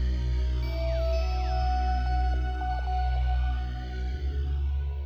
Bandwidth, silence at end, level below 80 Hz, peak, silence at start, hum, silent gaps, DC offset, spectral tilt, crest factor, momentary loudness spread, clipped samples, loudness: 6.2 kHz; 0 s; -28 dBFS; -18 dBFS; 0 s; 60 Hz at -45 dBFS; none; under 0.1%; -7 dB/octave; 10 dB; 4 LU; under 0.1%; -30 LUFS